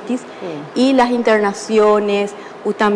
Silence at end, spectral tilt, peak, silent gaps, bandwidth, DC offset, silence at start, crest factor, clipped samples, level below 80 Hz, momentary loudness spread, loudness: 0 s; -5 dB/octave; -4 dBFS; none; 10.5 kHz; under 0.1%; 0 s; 12 dB; under 0.1%; -58 dBFS; 12 LU; -16 LUFS